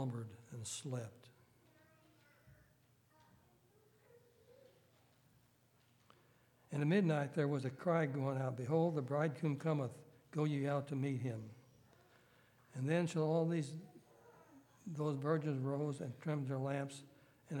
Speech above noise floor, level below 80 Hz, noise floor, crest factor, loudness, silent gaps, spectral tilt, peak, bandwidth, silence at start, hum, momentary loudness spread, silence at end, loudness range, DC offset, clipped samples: 34 dB; -84 dBFS; -72 dBFS; 20 dB; -39 LUFS; none; -7 dB/octave; -22 dBFS; 17.5 kHz; 0 s; none; 14 LU; 0 s; 8 LU; under 0.1%; under 0.1%